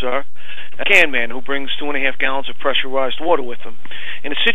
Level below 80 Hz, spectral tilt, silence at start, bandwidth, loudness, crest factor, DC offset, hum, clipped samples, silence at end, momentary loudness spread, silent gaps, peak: -62 dBFS; -3.5 dB/octave; 0 s; 15.5 kHz; -18 LUFS; 22 dB; 20%; none; under 0.1%; 0 s; 22 LU; none; 0 dBFS